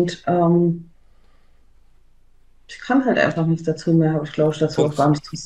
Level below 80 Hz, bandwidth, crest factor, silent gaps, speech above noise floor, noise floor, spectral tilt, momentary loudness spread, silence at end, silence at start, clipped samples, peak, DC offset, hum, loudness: -52 dBFS; 9.8 kHz; 16 dB; none; 31 dB; -50 dBFS; -7 dB/octave; 5 LU; 0 s; 0 s; under 0.1%; -4 dBFS; under 0.1%; none; -19 LUFS